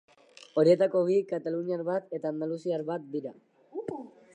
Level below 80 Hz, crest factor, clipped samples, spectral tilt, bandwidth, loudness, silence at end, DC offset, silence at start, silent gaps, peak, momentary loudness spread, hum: -82 dBFS; 20 dB; under 0.1%; -7.5 dB/octave; 9 kHz; -29 LUFS; 0.25 s; under 0.1%; 0.55 s; none; -10 dBFS; 16 LU; none